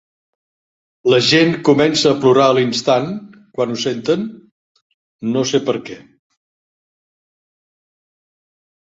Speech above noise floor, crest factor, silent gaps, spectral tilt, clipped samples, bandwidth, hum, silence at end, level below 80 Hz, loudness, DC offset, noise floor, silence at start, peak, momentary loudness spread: over 75 dB; 18 dB; 4.52-4.75 s, 4.82-5.19 s; -4.5 dB/octave; under 0.1%; 8 kHz; none; 3 s; -58 dBFS; -15 LUFS; under 0.1%; under -90 dBFS; 1.05 s; 0 dBFS; 15 LU